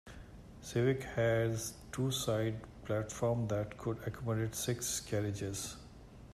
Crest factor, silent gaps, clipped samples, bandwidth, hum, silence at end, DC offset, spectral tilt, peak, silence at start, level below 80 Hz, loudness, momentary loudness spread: 16 dB; none; under 0.1%; 14.5 kHz; none; 0 s; under 0.1%; -5 dB/octave; -20 dBFS; 0.05 s; -58 dBFS; -36 LUFS; 17 LU